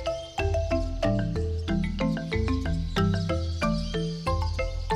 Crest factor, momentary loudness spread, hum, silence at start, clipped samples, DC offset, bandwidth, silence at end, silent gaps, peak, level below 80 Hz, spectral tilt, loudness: 14 dB; 4 LU; none; 0 s; under 0.1%; under 0.1%; 11.5 kHz; 0 s; none; -14 dBFS; -34 dBFS; -6.5 dB/octave; -28 LUFS